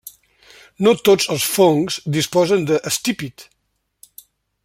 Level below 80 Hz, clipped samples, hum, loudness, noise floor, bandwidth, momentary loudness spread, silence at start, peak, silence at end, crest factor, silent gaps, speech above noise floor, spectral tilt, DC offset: -60 dBFS; under 0.1%; none; -17 LUFS; -71 dBFS; 16.5 kHz; 7 LU; 0.05 s; -2 dBFS; 1.2 s; 18 dB; none; 54 dB; -4 dB/octave; under 0.1%